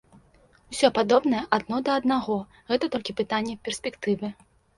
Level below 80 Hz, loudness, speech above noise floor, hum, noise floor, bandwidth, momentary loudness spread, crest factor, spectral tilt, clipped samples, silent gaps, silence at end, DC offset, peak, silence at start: -60 dBFS; -25 LUFS; 33 dB; none; -58 dBFS; 11.5 kHz; 10 LU; 22 dB; -4.5 dB/octave; under 0.1%; none; 0.45 s; under 0.1%; -4 dBFS; 0.7 s